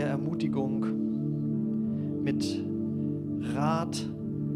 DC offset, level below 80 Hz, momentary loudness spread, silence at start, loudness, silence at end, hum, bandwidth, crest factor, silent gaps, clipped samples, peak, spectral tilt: under 0.1%; -62 dBFS; 4 LU; 0 s; -31 LUFS; 0 s; 50 Hz at -55 dBFS; 11.5 kHz; 16 dB; none; under 0.1%; -14 dBFS; -7 dB/octave